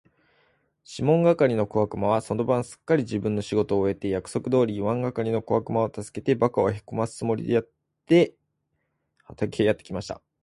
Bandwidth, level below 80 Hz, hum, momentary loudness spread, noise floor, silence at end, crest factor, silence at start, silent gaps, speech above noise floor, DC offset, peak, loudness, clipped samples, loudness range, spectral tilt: 11.5 kHz; -54 dBFS; none; 9 LU; -76 dBFS; 0.25 s; 18 dB; 0.9 s; none; 52 dB; under 0.1%; -6 dBFS; -25 LUFS; under 0.1%; 2 LU; -7 dB/octave